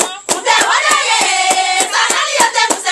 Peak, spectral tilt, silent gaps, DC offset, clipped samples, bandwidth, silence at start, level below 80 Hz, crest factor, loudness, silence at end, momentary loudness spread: 0 dBFS; 1.5 dB/octave; none; under 0.1%; under 0.1%; 13 kHz; 0 s; -58 dBFS; 14 dB; -11 LUFS; 0 s; 2 LU